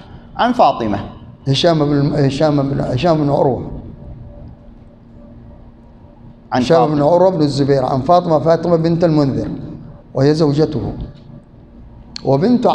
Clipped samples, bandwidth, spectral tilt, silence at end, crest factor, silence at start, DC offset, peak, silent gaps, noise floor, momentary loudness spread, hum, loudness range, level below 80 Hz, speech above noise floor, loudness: under 0.1%; 9.4 kHz; -7.5 dB/octave; 0 s; 16 dB; 0 s; under 0.1%; 0 dBFS; none; -41 dBFS; 19 LU; none; 7 LU; -40 dBFS; 27 dB; -15 LUFS